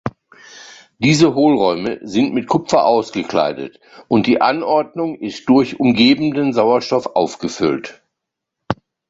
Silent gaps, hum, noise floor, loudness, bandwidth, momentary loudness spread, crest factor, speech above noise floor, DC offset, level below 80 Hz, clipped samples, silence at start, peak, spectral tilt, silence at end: none; none; -80 dBFS; -16 LUFS; 8 kHz; 13 LU; 16 dB; 64 dB; under 0.1%; -52 dBFS; under 0.1%; 0.05 s; 0 dBFS; -5.5 dB/octave; 0.35 s